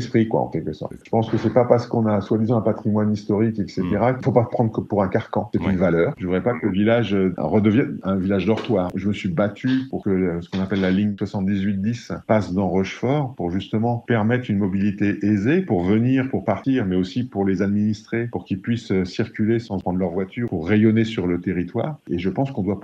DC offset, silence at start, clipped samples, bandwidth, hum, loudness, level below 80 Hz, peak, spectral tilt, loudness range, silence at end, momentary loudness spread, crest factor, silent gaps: under 0.1%; 0 s; under 0.1%; 7.6 kHz; none; -21 LUFS; -54 dBFS; 0 dBFS; -8.5 dB/octave; 2 LU; 0 s; 7 LU; 20 dB; none